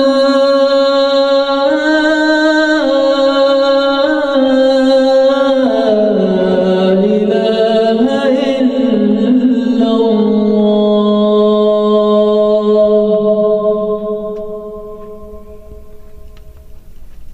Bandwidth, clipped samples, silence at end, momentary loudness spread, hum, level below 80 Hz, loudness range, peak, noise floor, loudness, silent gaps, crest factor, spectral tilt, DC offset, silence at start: 9.4 kHz; under 0.1%; 0 s; 3 LU; none; -42 dBFS; 5 LU; -2 dBFS; -32 dBFS; -11 LUFS; none; 10 dB; -6.5 dB/octave; under 0.1%; 0 s